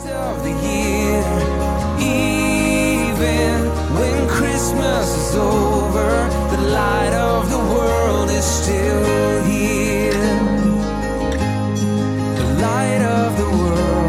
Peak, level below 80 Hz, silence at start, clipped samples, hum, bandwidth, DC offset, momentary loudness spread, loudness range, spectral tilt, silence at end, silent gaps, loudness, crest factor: -4 dBFS; -26 dBFS; 0 s; under 0.1%; none; 16.5 kHz; under 0.1%; 3 LU; 1 LU; -5.5 dB/octave; 0 s; none; -18 LUFS; 12 dB